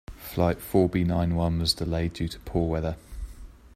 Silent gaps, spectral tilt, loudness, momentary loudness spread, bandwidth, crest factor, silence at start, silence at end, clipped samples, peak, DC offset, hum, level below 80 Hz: none; -6 dB/octave; -27 LUFS; 15 LU; 16 kHz; 20 dB; 0.1 s; 0.1 s; under 0.1%; -8 dBFS; under 0.1%; none; -40 dBFS